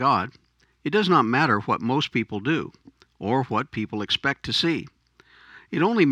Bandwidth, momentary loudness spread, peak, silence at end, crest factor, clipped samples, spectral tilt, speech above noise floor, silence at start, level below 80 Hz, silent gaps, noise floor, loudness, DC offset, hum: 11 kHz; 11 LU; -6 dBFS; 0 s; 18 dB; under 0.1%; -6 dB/octave; 34 dB; 0 s; -60 dBFS; none; -57 dBFS; -24 LUFS; under 0.1%; none